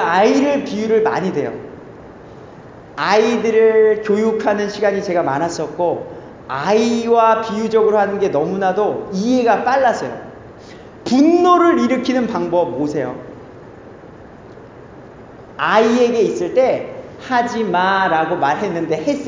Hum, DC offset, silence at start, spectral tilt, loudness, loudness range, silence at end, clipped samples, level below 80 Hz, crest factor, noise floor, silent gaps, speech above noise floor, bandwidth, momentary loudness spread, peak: none; under 0.1%; 0 s; -5.5 dB/octave; -16 LUFS; 4 LU; 0 s; under 0.1%; -54 dBFS; 16 dB; -38 dBFS; none; 23 dB; 7.6 kHz; 14 LU; -2 dBFS